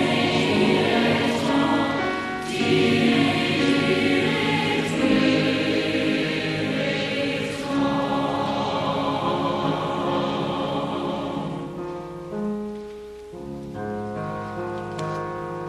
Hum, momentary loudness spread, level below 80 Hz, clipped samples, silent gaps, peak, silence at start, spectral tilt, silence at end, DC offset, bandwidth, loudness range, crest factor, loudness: none; 12 LU; -52 dBFS; under 0.1%; none; -8 dBFS; 0 s; -5.5 dB/octave; 0 s; under 0.1%; 13 kHz; 11 LU; 16 dB; -23 LUFS